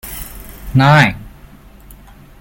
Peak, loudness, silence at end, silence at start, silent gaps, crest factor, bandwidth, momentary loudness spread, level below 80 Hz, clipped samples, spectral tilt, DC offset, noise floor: 0 dBFS; -12 LUFS; 1.1 s; 0.05 s; none; 16 dB; 17 kHz; 23 LU; -36 dBFS; under 0.1%; -6 dB/octave; under 0.1%; -40 dBFS